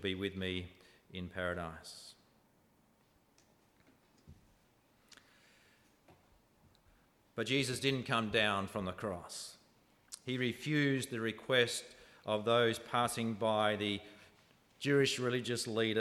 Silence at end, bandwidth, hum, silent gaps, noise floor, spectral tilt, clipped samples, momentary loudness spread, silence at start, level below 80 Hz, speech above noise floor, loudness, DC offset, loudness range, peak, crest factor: 0 s; 16 kHz; none; none; -71 dBFS; -4.5 dB/octave; under 0.1%; 18 LU; 0 s; -70 dBFS; 36 dB; -35 LUFS; under 0.1%; 13 LU; -16 dBFS; 22 dB